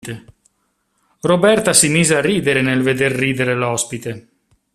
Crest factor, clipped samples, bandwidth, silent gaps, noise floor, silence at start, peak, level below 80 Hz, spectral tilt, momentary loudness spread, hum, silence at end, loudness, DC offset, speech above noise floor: 18 dB; under 0.1%; 15 kHz; none; -67 dBFS; 0.05 s; 0 dBFS; -52 dBFS; -3.5 dB/octave; 17 LU; none; 0.55 s; -15 LUFS; under 0.1%; 51 dB